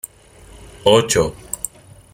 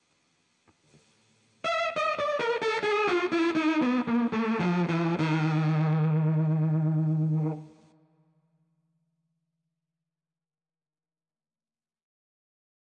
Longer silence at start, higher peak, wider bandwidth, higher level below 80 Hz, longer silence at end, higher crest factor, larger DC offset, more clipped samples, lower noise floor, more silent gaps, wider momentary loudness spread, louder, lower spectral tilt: second, 0.6 s vs 1.65 s; first, 0 dBFS vs -16 dBFS; first, 16.5 kHz vs 8.4 kHz; first, -42 dBFS vs -76 dBFS; second, 0.45 s vs 5.2 s; first, 20 dB vs 14 dB; neither; neither; second, -45 dBFS vs under -90 dBFS; neither; first, 15 LU vs 3 LU; first, -17 LUFS vs -27 LUFS; second, -3.5 dB/octave vs -7.5 dB/octave